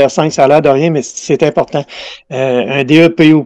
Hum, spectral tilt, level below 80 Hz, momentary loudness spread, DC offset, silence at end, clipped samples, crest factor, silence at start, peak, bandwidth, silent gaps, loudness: none; -5.5 dB/octave; -50 dBFS; 12 LU; under 0.1%; 0 s; 0.2%; 10 dB; 0 s; 0 dBFS; 8.6 kHz; none; -11 LUFS